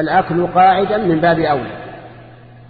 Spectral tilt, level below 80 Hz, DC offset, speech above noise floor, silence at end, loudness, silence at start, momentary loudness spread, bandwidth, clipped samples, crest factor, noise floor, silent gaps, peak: -10 dB/octave; -46 dBFS; under 0.1%; 25 dB; 0.45 s; -14 LUFS; 0 s; 17 LU; 4.9 kHz; under 0.1%; 14 dB; -39 dBFS; none; -2 dBFS